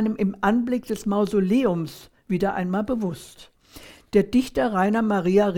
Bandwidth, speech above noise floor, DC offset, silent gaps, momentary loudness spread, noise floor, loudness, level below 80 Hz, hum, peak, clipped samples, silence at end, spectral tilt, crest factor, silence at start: 17 kHz; 25 dB; under 0.1%; none; 8 LU; -47 dBFS; -23 LUFS; -50 dBFS; none; -6 dBFS; under 0.1%; 0 s; -7 dB/octave; 16 dB; 0 s